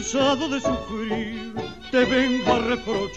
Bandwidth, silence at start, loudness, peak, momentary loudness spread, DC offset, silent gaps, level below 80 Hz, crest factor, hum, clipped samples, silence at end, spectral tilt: 8.2 kHz; 0 s; -23 LUFS; -6 dBFS; 11 LU; 0.3%; none; -46 dBFS; 16 dB; none; under 0.1%; 0 s; -4 dB/octave